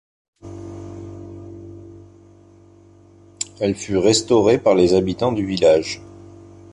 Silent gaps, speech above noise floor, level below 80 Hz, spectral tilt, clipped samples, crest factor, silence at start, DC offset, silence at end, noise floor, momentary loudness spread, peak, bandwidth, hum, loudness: none; 32 dB; -48 dBFS; -5 dB/octave; under 0.1%; 18 dB; 0.45 s; under 0.1%; 0.7 s; -48 dBFS; 22 LU; -2 dBFS; 11.5 kHz; none; -18 LUFS